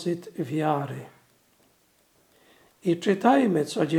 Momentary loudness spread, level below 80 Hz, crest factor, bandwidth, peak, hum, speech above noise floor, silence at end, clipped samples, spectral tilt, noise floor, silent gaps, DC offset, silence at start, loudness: 12 LU; -76 dBFS; 22 dB; 17 kHz; -6 dBFS; none; 40 dB; 0 s; under 0.1%; -6.5 dB/octave; -64 dBFS; none; under 0.1%; 0 s; -25 LUFS